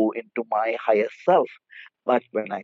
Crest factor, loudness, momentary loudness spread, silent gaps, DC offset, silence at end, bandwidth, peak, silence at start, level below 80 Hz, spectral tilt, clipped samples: 18 dB; -24 LUFS; 11 LU; none; under 0.1%; 0 s; 7.2 kHz; -6 dBFS; 0 s; -86 dBFS; -4 dB/octave; under 0.1%